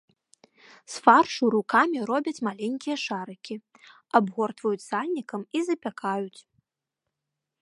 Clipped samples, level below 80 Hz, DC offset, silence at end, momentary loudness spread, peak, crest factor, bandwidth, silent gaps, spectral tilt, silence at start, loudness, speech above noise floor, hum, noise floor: under 0.1%; -80 dBFS; under 0.1%; 1.2 s; 17 LU; -2 dBFS; 26 dB; 11.5 kHz; none; -4.5 dB/octave; 0.9 s; -25 LUFS; 60 dB; none; -85 dBFS